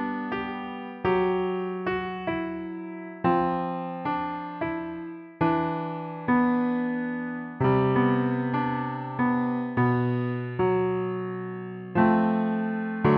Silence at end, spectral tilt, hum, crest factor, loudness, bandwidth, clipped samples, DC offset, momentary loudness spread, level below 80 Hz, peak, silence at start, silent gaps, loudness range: 0 s; -10.5 dB/octave; none; 16 dB; -27 LUFS; 5.2 kHz; under 0.1%; under 0.1%; 11 LU; -58 dBFS; -10 dBFS; 0 s; none; 4 LU